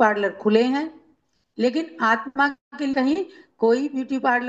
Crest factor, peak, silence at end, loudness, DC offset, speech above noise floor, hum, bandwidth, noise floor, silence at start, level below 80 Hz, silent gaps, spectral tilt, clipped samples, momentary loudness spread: 16 dB; -6 dBFS; 0 s; -22 LUFS; under 0.1%; 42 dB; none; 8 kHz; -64 dBFS; 0 s; -68 dBFS; 2.61-2.71 s; -5.5 dB/octave; under 0.1%; 8 LU